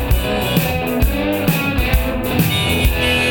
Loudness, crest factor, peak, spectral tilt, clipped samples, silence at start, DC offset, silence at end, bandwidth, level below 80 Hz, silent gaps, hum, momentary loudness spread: -17 LUFS; 16 dB; 0 dBFS; -5 dB/octave; under 0.1%; 0 s; 0.4%; 0 s; over 20 kHz; -22 dBFS; none; none; 3 LU